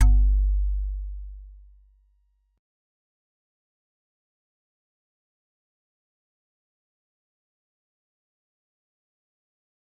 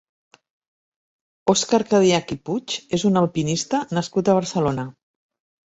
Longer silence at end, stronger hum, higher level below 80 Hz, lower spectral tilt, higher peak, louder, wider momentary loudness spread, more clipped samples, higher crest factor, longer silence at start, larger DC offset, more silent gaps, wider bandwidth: first, 8.5 s vs 0.75 s; neither; first, -30 dBFS vs -56 dBFS; first, -8 dB/octave vs -5 dB/octave; second, -8 dBFS vs -4 dBFS; second, -26 LUFS vs -21 LUFS; first, 22 LU vs 9 LU; neither; about the same, 22 dB vs 18 dB; second, 0 s vs 1.45 s; neither; neither; second, 2.3 kHz vs 8.2 kHz